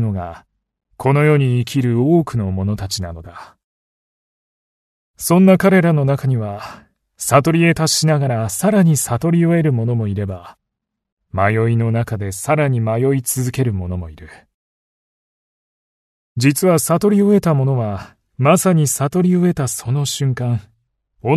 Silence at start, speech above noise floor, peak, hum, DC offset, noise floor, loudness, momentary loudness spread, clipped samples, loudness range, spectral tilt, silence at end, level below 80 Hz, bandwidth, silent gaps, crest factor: 0 s; 63 dB; 0 dBFS; none; under 0.1%; -78 dBFS; -16 LUFS; 13 LU; under 0.1%; 6 LU; -6 dB/octave; 0 s; -48 dBFS; 13.5 kHz; 3.64-5.14 s, 11.12-11.17 s, 14.54-16.36 s; 16 dB